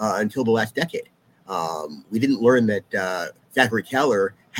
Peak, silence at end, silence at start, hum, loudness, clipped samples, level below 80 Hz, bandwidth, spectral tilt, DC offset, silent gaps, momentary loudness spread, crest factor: -2 dBFS; 0 s; 0 s; none; -22 LUFS; under 0.1%; -66 dBFS; 17 kHz; -5 dB/octave; under 0.1%; none; 11 LU; 22 dB